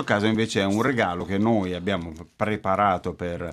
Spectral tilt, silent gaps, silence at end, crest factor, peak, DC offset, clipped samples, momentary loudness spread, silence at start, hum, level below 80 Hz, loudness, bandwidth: -6 dB/octave; none; 0 s; 18 dB; -6 dBFS; under 0.1%; under 0.1%; 8 LU; 0 s; none; -56 dBFS; -24 LUFS; 13.5 kHz